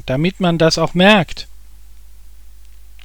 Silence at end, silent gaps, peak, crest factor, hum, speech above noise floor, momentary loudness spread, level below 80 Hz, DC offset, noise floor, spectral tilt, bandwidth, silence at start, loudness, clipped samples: 1.6 s; none; 0 dBFS; 18 dB; none; 28 dB; 19 LU; -38 dBFS; 2%; -42 dBFS; -5 dB/octave; 18 kHz; 0 s; -14 LUFS; under 0.1%